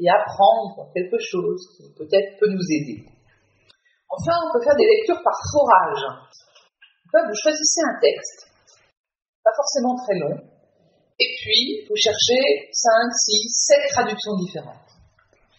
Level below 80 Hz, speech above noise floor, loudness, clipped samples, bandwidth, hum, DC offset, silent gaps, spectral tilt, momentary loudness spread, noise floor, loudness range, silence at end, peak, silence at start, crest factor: -62 dBFS; 42 dB; -19 LUFS; under 0.1%; 7.4 kHz; none; under 0.1%; 8.97-9.04 s, 9.29-9.43 s; -2 dB/octave; 13 LU; -62 dBFS; 7 LU; 0.85 s; -2 dBFS; 0 s; 20 dB